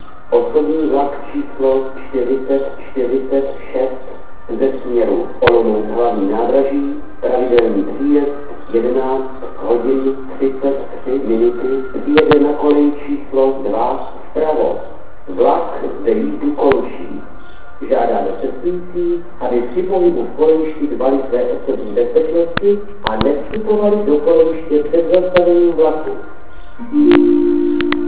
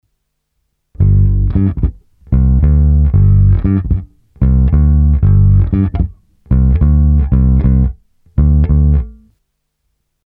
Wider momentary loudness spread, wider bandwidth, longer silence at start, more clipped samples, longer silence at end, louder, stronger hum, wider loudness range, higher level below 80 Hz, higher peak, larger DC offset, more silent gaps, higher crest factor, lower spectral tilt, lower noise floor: about the same, 11 LU vs 9 LU; first, 4 kHz vs 2.5 kHz; second, 0 s vs 1 s; neither; second, 0 s vs 1.15 s; second, -16 LUFS vs -12 LUFS; neither; first, 5 LU vs 2 LU; second, -42 dBFS vs -14 dBFS; about the same, 0 dBFS vs 0 dBFS; first, 8% vs under 0.1%; neither; first, 16 dB vs 10 dB; second, -10.5 dB/octave vs -13.5 dB/octave; second, -36 dBFS vs -68 dBFS